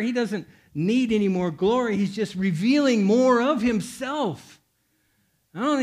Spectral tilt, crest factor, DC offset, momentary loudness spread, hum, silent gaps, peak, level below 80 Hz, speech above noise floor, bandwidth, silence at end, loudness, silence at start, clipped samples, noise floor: -6 dB/octave; 14 dB; under 0.1%; 10 LU; none; none; -8 dBFS; -58 dBFS; 46 dB; 13.5 kHz; 0 s; -23 LUFS; 0 s; under 0.1%; -69 dBFS